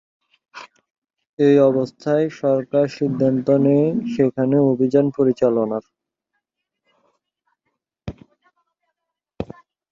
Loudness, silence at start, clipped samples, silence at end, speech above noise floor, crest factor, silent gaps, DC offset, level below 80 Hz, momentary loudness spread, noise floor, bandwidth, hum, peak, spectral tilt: -18 LUFS; 0.55 s; under 0.1%; 0.5 s; 62 dB; 18 dB; 0.90-1.02 s, 1.29-1.37 s; under 0.1%; -56 dBFS; 21 LU; -80 dBFS; 7.4 kHz; none; -4 dBFS; -9 dB/octave